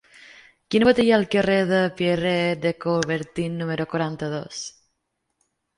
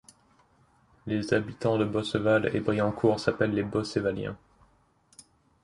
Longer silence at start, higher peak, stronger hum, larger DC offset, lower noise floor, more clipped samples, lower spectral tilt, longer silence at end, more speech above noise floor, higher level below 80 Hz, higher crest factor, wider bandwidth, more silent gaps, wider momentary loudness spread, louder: second, 0.7 s vs 1.05 s; first, -4 dBFS vs -8 dBFS; neither; neither; first, -76 dBFS vs -64 dBFS; neither; about the same, -5.5 dB/octave vs -6.5 dB/octave; first, 1.1 s vs 0.45 s; first, 55 dB vs 37 dB; about the same, -56 dBFS vs -56 dBFS; about the same, 20 dB vs 22 dB; about the same, 11.5 kHz vs 11.5 kHz; neither; about the same, 11 LU vs 9 LU; first, -22 LUFS vs -28 LUFS